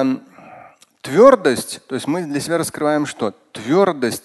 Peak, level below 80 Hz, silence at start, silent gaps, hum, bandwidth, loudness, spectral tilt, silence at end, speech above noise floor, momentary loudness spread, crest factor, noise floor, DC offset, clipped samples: 0 dBFS; -60 dBFS; 0 s; none; none; 12.5 kHz; -17 LUFS; -5 dB/octave; 0.05 s; 28 dB; 15 LU; 18 dB; -45 dBFS; under 0.1%; under 0.1%